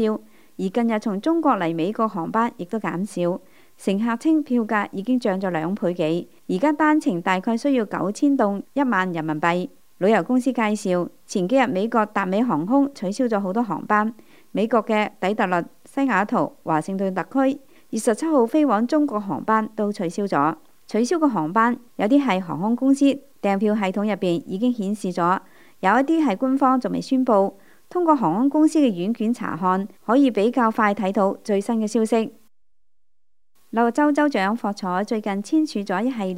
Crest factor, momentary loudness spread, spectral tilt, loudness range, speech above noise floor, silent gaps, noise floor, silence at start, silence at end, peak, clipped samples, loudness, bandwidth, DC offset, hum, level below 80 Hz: 18 dB; 7 LU; -6 dB/octave; 3 LU; 59 dB; none; -80 dBFS; 0 s; 0 s; -4 dBFS; under 0.1%; -22 LUFS; 15.5 kHz; 0.3%; none; -72 dBFS